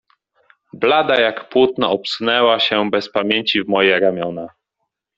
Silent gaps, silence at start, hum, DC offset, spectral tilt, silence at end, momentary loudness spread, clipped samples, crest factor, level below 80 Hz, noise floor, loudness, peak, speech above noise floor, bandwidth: none; 0.75 s; none; under 0.1%; -5 dB/octave; 0.7 s; 7 LU; under 0.1%; 16 dB; -60 dBFS; -76 dBFS; -16 LUFS; -2 dBFS; 60 dB; 7.8 kHz